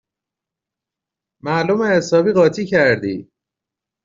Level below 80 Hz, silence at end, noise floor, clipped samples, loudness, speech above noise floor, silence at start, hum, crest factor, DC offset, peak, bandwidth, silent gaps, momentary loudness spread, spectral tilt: -58 dBFS; 0.85 s; -86 dBFS; under 0.1%; -16 LUFS; 70 dB; 1.45 s; none; 16 dB; under 0.1%; -2 dBFS; 7.6 kHz; none; 11 LU; -6 dB/octave